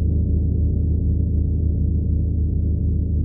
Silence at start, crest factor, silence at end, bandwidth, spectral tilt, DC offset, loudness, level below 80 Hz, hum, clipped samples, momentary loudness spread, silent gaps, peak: 0 s; 10 dB; 0 s; 0.8 kHz; -17 dB/octave; under 0.1%; -21 LUFS; -22 dBFS; none; under 0.1%; 1 LU; none; -10 dBFS